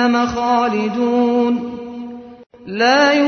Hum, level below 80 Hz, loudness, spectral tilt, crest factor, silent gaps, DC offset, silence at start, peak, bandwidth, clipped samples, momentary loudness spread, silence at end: none; -50 dBFS; -16 LUFS; -4.5 dB/octave; 14 dB; 2.46-2.50 s; under 0.1%; 0 s; -4 dBFS; 6.6 kHz; under 0.1%; 17 LU; 0 s